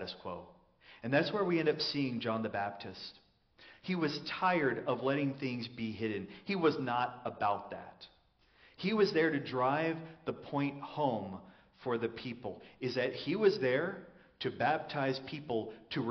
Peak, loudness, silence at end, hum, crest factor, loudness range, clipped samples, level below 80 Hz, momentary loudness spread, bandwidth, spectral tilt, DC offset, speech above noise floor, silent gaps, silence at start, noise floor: -16 dBFS; -35 LUFS; 0 s; none; 20 dB; 2 LU; under 0.1%; -72 dBFS; 14 LU; 6.4 kHz; -4 dB/octave; under 0.1%; 33 dB; none; 0 s; -68 dBFS